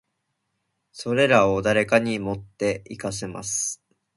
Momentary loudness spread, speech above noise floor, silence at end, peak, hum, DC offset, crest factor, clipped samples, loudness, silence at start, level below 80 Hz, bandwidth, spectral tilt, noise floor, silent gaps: 13 LU; 54 dB; 0.4 s; -4 dBFS; none; under 0.1%; 22 dB; under 0.1%; -23 LUFS; 0.95 s; -54 dBFS; 11.5 kHz; -4 dB/octave; -77 dBFS; none